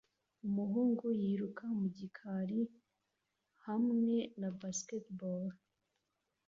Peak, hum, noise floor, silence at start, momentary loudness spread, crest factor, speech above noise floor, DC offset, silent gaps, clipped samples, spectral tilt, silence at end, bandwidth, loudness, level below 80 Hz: -24 dBFS; none; -86 dBFS; 0.45 s; 10 LU; 14 dB; 49 dB; under 0.1%; none; under 0.1%; -8 dB/octave; 0.9 s; 7.4 kHz; -38 LUFS; -80 dBFS